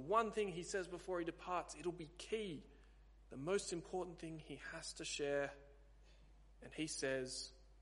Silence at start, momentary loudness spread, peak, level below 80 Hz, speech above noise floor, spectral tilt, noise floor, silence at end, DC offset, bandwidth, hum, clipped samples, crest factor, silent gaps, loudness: 0 s; 11 LU; -22 dBFS; -64 dBFS; 21 dB; -3.5 dB/octave; -65 dBFS; 0 s; under 0.1%; 11.5 kHz; none; under 0.1%; 22 dB; none; -45 LUFS